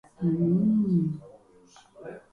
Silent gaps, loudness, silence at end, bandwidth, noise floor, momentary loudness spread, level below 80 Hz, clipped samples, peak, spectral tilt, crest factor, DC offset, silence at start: none; -25 LUFS; 0.15 s; 6.6 kHz; -56 dBFS; 21 LU; -62 dBFS; under 0.1%; -14 dBFS; -10.5 dB/octave; 12 dB; under 0.1%; 0.2 s